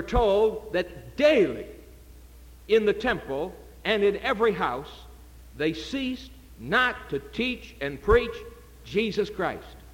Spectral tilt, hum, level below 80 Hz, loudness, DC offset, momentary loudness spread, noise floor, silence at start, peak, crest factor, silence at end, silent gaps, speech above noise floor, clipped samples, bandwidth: -5.5 dB/octave; none; -42 dBFS; -26 LUFS; under 0.1%; 16 LU; -48 dBFS; 0 s; -8 dBFS; 20 dB; 0.05 s; none; 23 dB; under 0.1%; 17 kHz